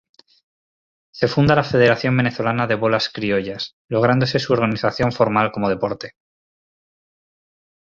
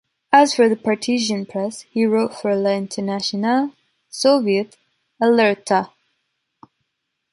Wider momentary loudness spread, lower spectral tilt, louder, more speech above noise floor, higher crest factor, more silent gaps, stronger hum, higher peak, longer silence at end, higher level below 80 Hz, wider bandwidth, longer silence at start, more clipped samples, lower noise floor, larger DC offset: about the same, 8 LU vs 10 LU; first, -7 dB/octave vs -4.5 dB/octave; about the same, -19 LUFS vs -19 LUFS; first, over 72 dB vs 58 dB; about the same, 18 dB vs 18 dB; first, 3.73-3.88 s vs none; neither; about the same, -2 dBFS vs -2 dBFS; first, 1.8 s vs 1.45 s; first, -50 dBFS vs -68 dBFS; second, 7.4 kHz vs 11.5 kHz; first, 1.15 s vs 0.3 s; neither; first, under -90 dBFS vs -76 dBFS; neither